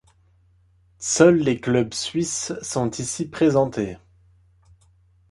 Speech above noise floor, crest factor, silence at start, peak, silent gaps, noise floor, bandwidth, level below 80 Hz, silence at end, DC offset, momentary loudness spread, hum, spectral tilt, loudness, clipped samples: 38 dB; 20 dB; 1 s; -2 dBFS; none; -59 dBFS; 11.5 kHz; -54 dBFS; 1.35 s; under 0.1%; 13 LU; none; -4.5 dB/octave; -21 LUFS; under 0.1%